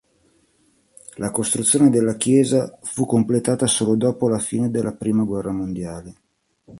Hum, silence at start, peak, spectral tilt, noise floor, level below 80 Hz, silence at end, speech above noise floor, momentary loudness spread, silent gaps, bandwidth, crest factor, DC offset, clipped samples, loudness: none; 1.15 s; -2 dBFS; -5 dB/octave; -61 dBFS; -52 dBFS; 0 s; 42 dB; 12 LU; none; 12 kHz; 18 dB; under 0.1%; under 0.1%; -20 LUFS